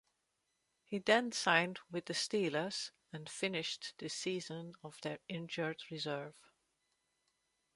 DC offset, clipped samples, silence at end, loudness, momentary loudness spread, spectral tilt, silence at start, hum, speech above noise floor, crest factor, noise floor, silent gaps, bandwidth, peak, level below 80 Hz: under 0.1%; under 0.1%; 1.45 s; -38 LUFS; 15 LU; -3.5 dB/octave; 0.9 s; none; 45 dB; 26 dB; -83 dBFS; none; 11.5 kHz; -14 dBFS; -82 dBFS